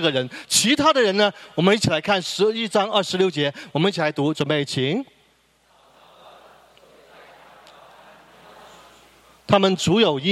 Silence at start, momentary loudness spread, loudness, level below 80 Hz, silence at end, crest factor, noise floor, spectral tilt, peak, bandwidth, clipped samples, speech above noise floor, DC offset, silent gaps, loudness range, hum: 0 s; 7 LU; -20 LUFS; -60 dBFS; 0 s; 22 dB; -60 dBFS; -4 dB/octave; 0 dBFS; 14.5 kHz; under 0.1%; 40 dB; under 0.1%; none; 10 LU; none